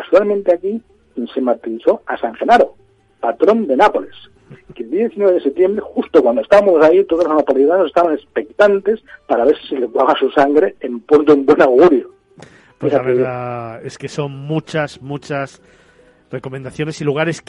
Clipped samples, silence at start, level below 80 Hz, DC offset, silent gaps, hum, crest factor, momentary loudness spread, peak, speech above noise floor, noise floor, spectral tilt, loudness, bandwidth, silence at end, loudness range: under 0.1%; 0 s; -54 dBFS; under 0.1%; none; none; 14 dB; 16 LU; 0 dBFS; 35 dB; -50 dBFS; -6.5 dB/octave; -15 LUFS; 10.5 kHz; 0.1 s; 9 LU